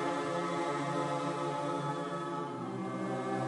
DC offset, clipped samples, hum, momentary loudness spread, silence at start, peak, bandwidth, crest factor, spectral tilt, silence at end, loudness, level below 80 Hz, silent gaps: under 0.1%; under 0.1%; none; 4 LU; 0 s; -22 dBFS; 10.5 kHz; 14 dB; -6 dB/octave; 0 s; -36 LUFS; -74 dBFS; none